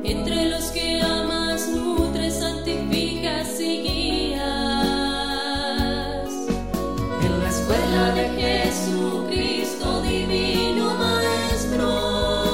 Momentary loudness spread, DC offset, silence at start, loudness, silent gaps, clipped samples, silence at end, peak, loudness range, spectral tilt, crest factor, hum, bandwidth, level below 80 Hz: 4 LU; 0.9%; 0 s; -23 LUFS; none; under 0.1%; 0 s; -8 dBFS; 2 LU; -4.5 dB/octave; 16 dB; none; 16 kHz; -34 dBFS